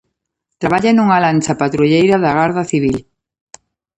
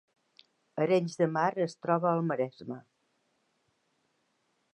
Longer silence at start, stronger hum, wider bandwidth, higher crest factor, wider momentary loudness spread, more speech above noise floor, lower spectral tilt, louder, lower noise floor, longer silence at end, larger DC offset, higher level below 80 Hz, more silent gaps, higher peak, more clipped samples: second, 0.6 s vs 0.75 s; neither; about the same, 10.5 kHz vs 10.5 kHz; second, 14 dB vs 20 dB; second, 7 LU vs 16 LU; first, 62 dB vs 46 dB; about the same, -6 dB/octave vs -7 dB/octave; first, -14 LUFS vs -30 LUFS; about the same, -75 dBFS vs -76 dBFS; second, 0.95 s vs 1.95 s; neither; first, -48 dBFS vs -84 dBFS; neither; first, 0 dBFS vs -12 dBFS; neither